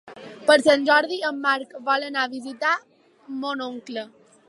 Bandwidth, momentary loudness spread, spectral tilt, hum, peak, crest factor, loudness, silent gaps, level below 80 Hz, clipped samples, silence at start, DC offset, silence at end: 11.5 kHz; 17 LU; -2.5 dB/octave; none; -2 dBFS; 22 dB; -22 LUFS; none; -72 dBFS; under 0.1%; 0.05 s; under 0.1%; 0.45 s